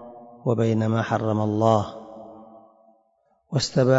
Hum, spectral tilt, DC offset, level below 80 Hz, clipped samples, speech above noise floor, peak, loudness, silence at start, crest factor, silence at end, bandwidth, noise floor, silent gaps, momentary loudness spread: none; -6.5 dB/octave; under 0.1%; -60 dBFS; under 0.1%; 45 dB; -6 dBFS; -23 LUFS; 0 s; 18 dB; 0 s; 8 kHz; -66 dBFS; none; 22 LU